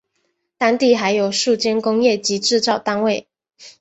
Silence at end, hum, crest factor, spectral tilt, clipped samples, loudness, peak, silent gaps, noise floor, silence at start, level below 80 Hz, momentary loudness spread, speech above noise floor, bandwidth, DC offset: 0.1 s; none; 16 dB; -3 dB/octave; under 0.1%; -17 LUFS; -2 dBFS; none; -70 dBFS; 0.6 s; -64 dBFS; 5 LU; 53 dB; 8.2 kHz; under 0.1%